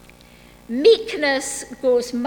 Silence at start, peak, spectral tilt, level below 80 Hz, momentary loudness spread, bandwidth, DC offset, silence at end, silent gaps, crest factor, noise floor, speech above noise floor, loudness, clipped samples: 0.7 s; -2 dBFS; -2.5 dB/octave; -54 dBFS; 11 LU; 18.5 kHz; under 0.1%; 0 s; none; 18 dB; -47 dBFS; 28 dB; -19 LUFS; under 0.1%